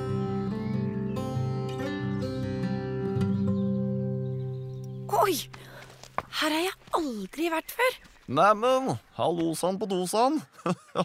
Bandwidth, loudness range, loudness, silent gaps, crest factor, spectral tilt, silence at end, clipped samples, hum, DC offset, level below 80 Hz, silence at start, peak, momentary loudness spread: 16 kHz; 4 LU; -29 LUFS; none; 20 dB; -5.5 dB/octave; 0 s; under 0.1%; none; under 0.1%; -56 dBFS; 0 s; -8 dBFS; 10 LU